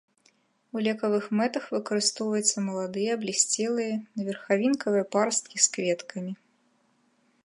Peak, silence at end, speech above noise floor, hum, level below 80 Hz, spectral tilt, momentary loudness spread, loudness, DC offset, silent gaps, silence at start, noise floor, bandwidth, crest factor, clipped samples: -6 dBFS; 1.1 s; 41 dB; none; -78 dBFS; -3 dB/octave; 10 LU; -27 LUFS; under 0.1%; none; 0.75 s; -68 dBFS; 11.5 kHz; 22 dB; under 0.1%